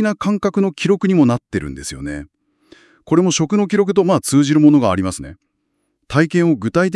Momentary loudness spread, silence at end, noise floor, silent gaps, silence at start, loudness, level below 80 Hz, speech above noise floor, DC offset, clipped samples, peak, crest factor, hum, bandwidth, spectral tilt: 15 LU; 0 s; -69 dBFS; none; 0 s; -16 LUFS; -46 dBFS; 54 dB; under 0.1%; under 0.1%; 0 dBFS; 16 dB; none; 12 kHz; -6 dB/octave